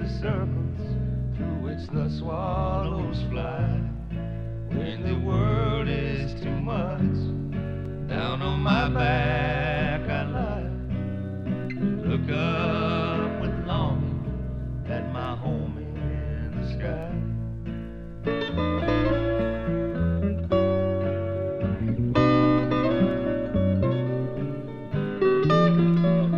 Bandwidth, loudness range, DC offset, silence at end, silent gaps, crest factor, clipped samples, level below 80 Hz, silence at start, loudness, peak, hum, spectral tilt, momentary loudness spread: 7 kHz; 6 LU; under 0.1%; 0 s; none; 18 dB; under 0.1%; -36 dBFS; 0 s; -26 LUFS; -8 dBFS; none; -9 dB/octave; 10 LU